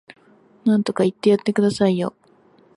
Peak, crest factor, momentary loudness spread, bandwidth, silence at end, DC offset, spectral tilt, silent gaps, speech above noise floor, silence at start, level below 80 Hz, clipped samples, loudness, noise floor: -6 dBFS; 16 dB; 7 LU; 11.5 kHz; 0.65 s; under 0.1%; -7 dB/octave; none; 36 dB; 0.65 s; -62 dBFS; under 0.1%; -20 LUFS; -54 dBFS